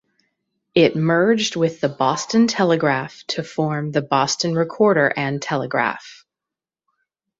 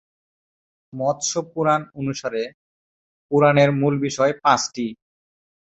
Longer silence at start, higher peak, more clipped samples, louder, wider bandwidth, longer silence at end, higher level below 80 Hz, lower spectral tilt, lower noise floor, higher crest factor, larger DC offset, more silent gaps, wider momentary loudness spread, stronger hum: second, 0.75 s vs 0.95 s; about the same, -2 dBFS vs -2 dBFS; neither; about the same, -19 LUFS vs -21 LUFS; about the same, 8 kHz vs 8.2 kHz; first, 1.25 s vs 0.85 s; about the same, -62 dBFS vs -60 dBFS; about the same, -5 dB/octave vs -5 dB/octave; about the same, -88 dBFS vs under -90 dBFS; about the same, 18 dB vs 20 dB; neither; second, none vs 2.54-3.29 s; second, 7 LU vs 13 LU; neither